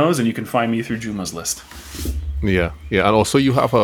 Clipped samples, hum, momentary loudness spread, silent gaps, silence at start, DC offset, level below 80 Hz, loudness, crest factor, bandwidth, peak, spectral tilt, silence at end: under 0.1%; none; 11 LU; none; 0 s; under 0.1%; -32 dBFS; -20 LUFS; 16 dB; 19.5 kHz; -2 dBFS; -5 dB/octave; 0 s